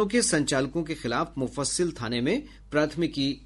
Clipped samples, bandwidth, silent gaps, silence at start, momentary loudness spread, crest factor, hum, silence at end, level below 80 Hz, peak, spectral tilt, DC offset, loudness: under 0.1%; 11.5 kHz; none; 0 s; 7 LU; 16 dB; none; 0 s; -50 dBFS; -10 dBFS; -4 dB/octave; under 0.1%; -27 LUFS